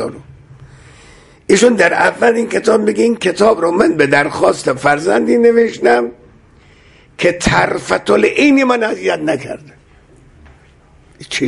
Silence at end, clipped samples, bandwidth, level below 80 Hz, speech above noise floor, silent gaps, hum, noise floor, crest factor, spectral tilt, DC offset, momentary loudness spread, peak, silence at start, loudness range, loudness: 0 s; under 0.1%; 11.5 kHz; -44 dBFS; 34 dB; none; none; -46 dBFS; 14 dB; -4.5 dB/octave; under 0.1%; 8 LU; 0 dBFS; 0 s; 3 LU; -13 LUFS